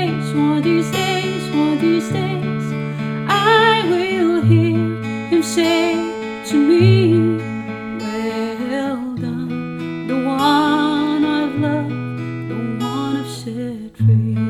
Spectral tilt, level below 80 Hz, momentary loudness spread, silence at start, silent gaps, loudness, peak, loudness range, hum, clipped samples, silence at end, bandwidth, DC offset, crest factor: -6.5 dB/octave; -56 dBFS; 12 LU; 0 s; none; -18 LUFS; -2 dBFS; 5 LU; none; under 0.1%; 0 s; 14.5 kHz; under 0.1%; 16 dB